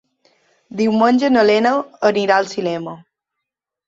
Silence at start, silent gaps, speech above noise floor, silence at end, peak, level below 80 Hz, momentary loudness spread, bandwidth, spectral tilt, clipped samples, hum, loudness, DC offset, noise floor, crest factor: 0.75 s; none; 66 dB; 0.9 s; -2 dBFS; -62 dBFS; 12 LU; 7.8 kHz; -5.5 dB/octave; under 0.1%; none; -16 LUFS; under 0.1%; -82 dBFS; 16 dB